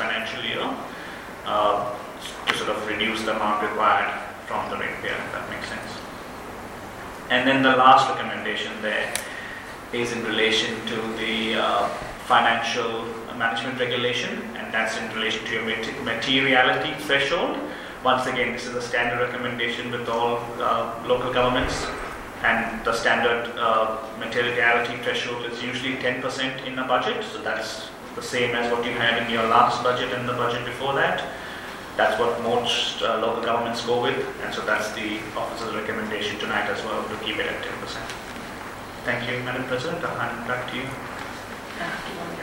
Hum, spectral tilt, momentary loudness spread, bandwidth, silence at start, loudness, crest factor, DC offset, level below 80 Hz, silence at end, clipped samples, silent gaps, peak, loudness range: none; -3.5 dB/octave; 13 LU; 16.5 kHz; 0 s; -24 LUFS; 22 dB; under 0.1%; -50 dBFS; 0 s; under 0.1%; none; -2 dBFS; 6 LU